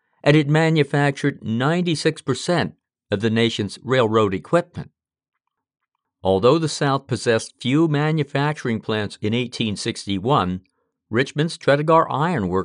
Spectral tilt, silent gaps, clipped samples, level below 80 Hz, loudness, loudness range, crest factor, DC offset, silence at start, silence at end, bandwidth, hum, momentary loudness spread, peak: -6 dB/octave; none; under 0.1%; -60 dBFS; -20 LUFS; 2 LU; 16 dB; under 0.1%; 0.25 s; 0 s; 10 kHz; none; 8 LU; -4 dBFS